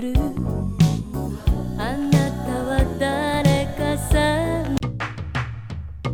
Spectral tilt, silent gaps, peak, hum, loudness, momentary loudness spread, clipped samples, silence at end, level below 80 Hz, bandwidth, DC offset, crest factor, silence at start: -6.5 dB/octave; none; -4 dBFS; none; -22 LUFS; 9 LU; under 0.1%; 0 s; -28 dBFS; 18 kHz; under 0.1%; 18 dB; 0 s